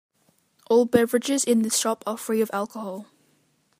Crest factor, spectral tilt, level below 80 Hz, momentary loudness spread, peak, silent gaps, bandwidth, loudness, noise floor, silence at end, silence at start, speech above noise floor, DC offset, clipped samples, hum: 22 dB; -3.5 dB/octave; -68 dBFS; 13 LU; -2 dBFS; none; 15.5 kHz; -23 LUFS; -66 dBFS; 0.75 s; 0.7 s; 43 dB; under 0.1%; under 0.1%; none